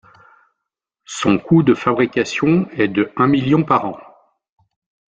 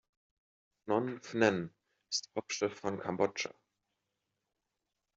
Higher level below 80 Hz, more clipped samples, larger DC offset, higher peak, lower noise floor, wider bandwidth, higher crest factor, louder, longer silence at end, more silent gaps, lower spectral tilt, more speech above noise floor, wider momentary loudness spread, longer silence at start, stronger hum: first, -54 dBFS vs -78 dBFS; neither; neither; first, -2 dBFS vs -12 dBFS; second, -81 dBFS vs -87 dBFS; first, 9 kHz vs 8 kHz; second, 18 dB vs 26 dB; first, -16 LUFS vs -35 LUFS; second, 1.1 s vs 1.65 s; neither; first, -6.5 dB/octave vs -4 dB/octave; first, 65 dB vs 53 dB; second, 7 LU vs 10 LU; first, 1.1 s vs 0.85 s; neither